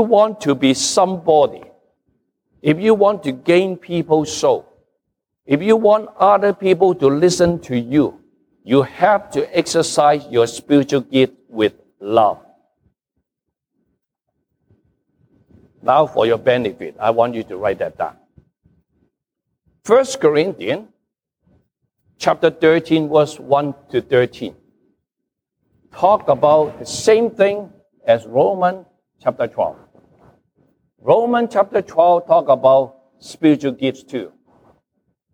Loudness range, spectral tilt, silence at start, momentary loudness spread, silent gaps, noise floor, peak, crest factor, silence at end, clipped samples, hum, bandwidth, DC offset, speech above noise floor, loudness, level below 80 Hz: 5 LU; -5 dB/octave; 0 s; 10 LU; none; -80 dBFS; -2 dBFS; 16 dB; 1.05 s; under 0.1%; none; 15.5 kHz; under 0.1%; 65 dB; -16 LUFS; -56 dBFS